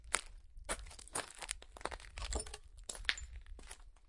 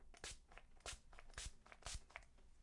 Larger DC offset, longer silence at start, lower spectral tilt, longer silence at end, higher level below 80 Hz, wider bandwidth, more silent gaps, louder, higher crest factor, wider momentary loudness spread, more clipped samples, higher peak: neither; about the same, 0 s vs 0 s; about the same, -1.5 dB/octave vs -1.5 dB/octave; about the same, 0 s vs 0 s; first, -52 dBFS vs -60 dBFS; about the same, 11.5 kHz vs 11.5 kHz; neither; first, -43 LUFS vs -56 LUFS; first, 36 dB vs 24 dB; first, 15 LU vs 7 LU; neither; first, -10 dBFS vs -32 dBFS